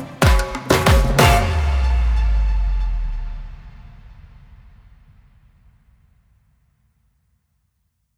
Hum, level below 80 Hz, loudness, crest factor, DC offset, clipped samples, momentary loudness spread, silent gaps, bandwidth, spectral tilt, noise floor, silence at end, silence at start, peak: none; -22 dBFS; -18 LUFS; 20 dB; under 0.1%; under 0.1%; 20 LU; none; 18.5 kHz; -5 dB/octave; -69 dBFS; 4.05 s; 0 s; 0 dBFS